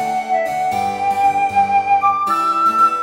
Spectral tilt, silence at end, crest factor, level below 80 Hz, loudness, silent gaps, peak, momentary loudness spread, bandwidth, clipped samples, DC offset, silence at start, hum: -4 dB/octave; 0 s; 12 dB; -56 dBFS; -16 LUFS; none; -4 dBFS; 5 LU; 16.5 kHz; under 0.1%; under 0.1%; 0 s; none